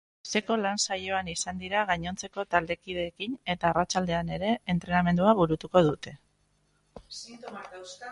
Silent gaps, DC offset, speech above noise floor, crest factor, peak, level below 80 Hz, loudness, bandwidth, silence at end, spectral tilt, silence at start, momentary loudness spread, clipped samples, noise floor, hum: none; under 0.1%; 41 dB; 22 dB; -8 dBFS; -54 dBFS; -28 LUFS; 11.5 kHz; 0 s; -4.5 dB/octave; 0.25 s; 18 LU; under 0.1%; -70 dBFS; none